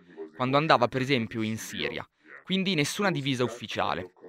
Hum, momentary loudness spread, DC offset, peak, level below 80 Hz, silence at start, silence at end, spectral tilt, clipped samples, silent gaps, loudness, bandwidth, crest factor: none; 10 LU; under 0.1%; -4 dBFS; -64 dBFS; 0.1 s; 0 s; -5 dB/octave; under 0.1%; none; -27 LUFS; 16 kHz; 24 dB